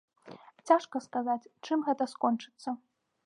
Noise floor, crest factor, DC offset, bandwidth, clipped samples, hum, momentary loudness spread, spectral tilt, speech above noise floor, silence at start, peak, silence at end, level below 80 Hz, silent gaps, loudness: -53 dBFS; 22 dB; under 0.1%; 11 kHz; under 0.1%; none; 18 LU; -5 dB/octave; 22 dB; 0.25 s; -12 dBFS; 0.5 s; -90 dBFS; none; -31 LUFS